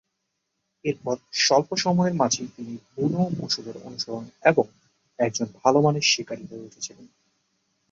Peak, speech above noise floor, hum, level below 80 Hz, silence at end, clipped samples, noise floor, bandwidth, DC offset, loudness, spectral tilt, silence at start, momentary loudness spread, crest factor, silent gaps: -4 dBFS; 54 dB; none; -66 dBFS; 0.85 s; under 0.1%; -78 dBFS; 7.8 kHz; under 0.1%; -24 LUFS; -4 dB/octave; 0.85 s; 16 LU; 22 dB; none